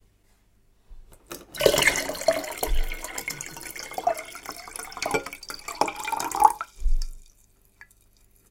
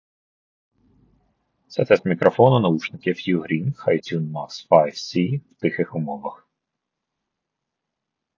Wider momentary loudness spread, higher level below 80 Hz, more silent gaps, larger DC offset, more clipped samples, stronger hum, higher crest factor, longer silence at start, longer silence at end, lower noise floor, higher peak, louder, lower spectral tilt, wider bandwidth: first, 16 LU vs 13 LU; first, -34 dBFS vs -64 dBFS; neither; neither; neither; neither; about the same, 26 dB vs 22 dB; second, 0.9 s vs 1.7 s; second, 1.25 s vs 2.05 s; second, -62 dBFS vs -82 dBFS; about the same, 0 dBFS vs 0 dBFS; second, -27 LUFS vs -21 LUFS; second, -2 dB/octave vs -7 dB/octave; first, 17 kHz vs 7.4 kHz